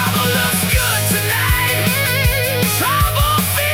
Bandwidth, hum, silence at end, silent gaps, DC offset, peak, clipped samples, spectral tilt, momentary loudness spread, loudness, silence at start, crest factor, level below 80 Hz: 18 kHz; none; 0 s; none; 0.2%; -2 dBFS; under 0.1%; -3.5 dB/octave; 1 LU; -15 LUFS; 0 s; 14 dB; -26 dBFS